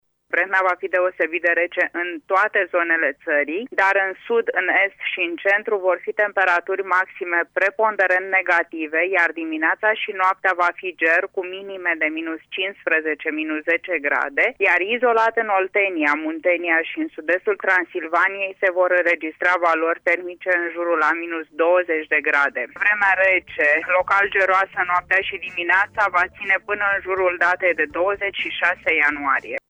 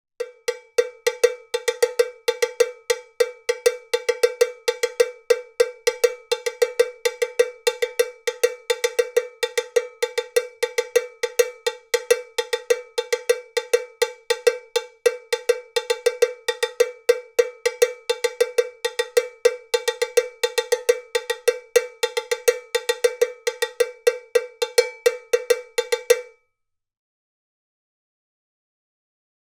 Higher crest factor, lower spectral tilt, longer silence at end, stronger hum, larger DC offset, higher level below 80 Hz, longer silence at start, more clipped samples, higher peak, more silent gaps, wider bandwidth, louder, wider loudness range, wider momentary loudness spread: second, 14 dB vs 20 dB; first, -4 dB/octave vs 2.5 dB/octave; second, 0.1 s vs 3.2 s; neither; neither; first, -62 dBFS vs -76 dBFS; about the same, 0.3 s vs 0.2 s; neither; second, -6 dBFS vs -2 dBFS; neither; second, 8.6 kHz vs 18.5 kHz; first, -19 LUFS vs -23 LUFS; about the same, 3 LU vs 1 LU; about the same, 5 LU vs 5 LU